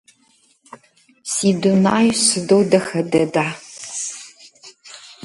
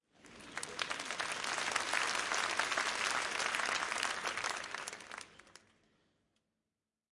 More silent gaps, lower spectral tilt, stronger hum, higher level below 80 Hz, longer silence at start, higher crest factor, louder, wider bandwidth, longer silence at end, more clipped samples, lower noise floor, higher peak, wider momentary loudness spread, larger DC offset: neither; first, -4 dB/octave vs 0 dB/octave; neither; first, -60 dBFS vs -74 dBFS; first, 1.25 s vs 0.25 s; second, 18 dB vs 24 dB; first, -17 LUFS vs -36 LUFS; about the same, 11.5 kHz vs 11.5 kHz; second, 0.1 s vs 1.65 s; neither; second, -58 dBFS vs under -90 dBFS; first, -2 dBFS vs -16 dBFS; first, 20 LU vs 13 LU; neither